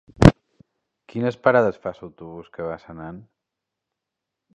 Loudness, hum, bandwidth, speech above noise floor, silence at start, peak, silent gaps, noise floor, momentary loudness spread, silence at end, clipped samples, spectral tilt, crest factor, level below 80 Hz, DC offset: -20 LUFS; none; 11.5 kHz; 60 dB; 0.2 s; 0 dBFS; none; -84 dBFS; 23 LU; 1.4 s; under 0.1%; -7.5 dB/octave; 24 dB; -36 dBFS; under 0.1%